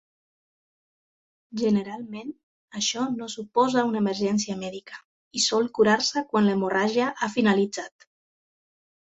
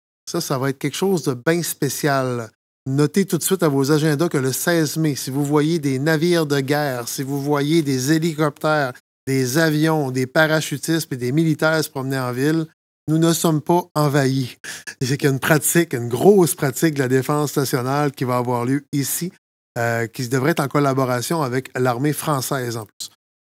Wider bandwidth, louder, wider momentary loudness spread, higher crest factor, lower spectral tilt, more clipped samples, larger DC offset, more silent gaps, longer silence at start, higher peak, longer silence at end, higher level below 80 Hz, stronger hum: second, 8.2 kHz vs 16.5 kHz; second, -24 LUFS vs -20 LUFS; first, 16 LU vs 8 LU; about the same, 20 dB vs 20 dB; about the same, -4 dB/octave vs -5 dB/octave; neither; neither; second, 2.43-2.68 s, 5.04-5.31 s vs 2.55-2.86 s, 9.00-9.27 s, 12.73-13.07 s, 13.91-13.95 s, 14.60-14.64 s, 18.88-18.92 s, 19.38-19.75 s, 22.93-23.00 s; first, 1.5 s vs 0.25 s; second, -6 dBFS vs 0 dBFS; first, 1.3 s vs 0.35 s; about the same, -68 dBFS vs -66 dBFS; neither